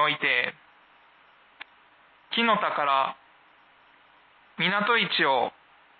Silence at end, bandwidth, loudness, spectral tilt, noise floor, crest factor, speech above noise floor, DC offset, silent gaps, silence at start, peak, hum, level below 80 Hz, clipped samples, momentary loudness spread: 0.5 s; 4.8 kHz; -24 LUFS; -8 dB/octave; -58 dBFS; 18 dB; 33 dB; under 0.1%; none; 0 s; -10 dBFS; none; -82 dBFS; under 0.1%; 25 LU